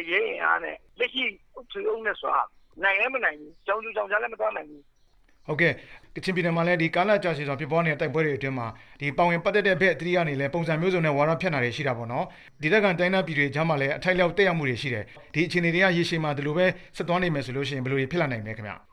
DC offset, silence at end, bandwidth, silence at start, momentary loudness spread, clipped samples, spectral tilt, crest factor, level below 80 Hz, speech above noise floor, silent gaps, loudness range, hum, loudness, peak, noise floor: under 0.1%; 0.15 s; 11.5 kHz; 0 s; 10 LU; under 0.1%; -6.5 dB/octave; 18 dB; -56 dBFS; 33 dB; none; 3 LU; none; -25 LUFS; -8 dBFS; -59 dBFS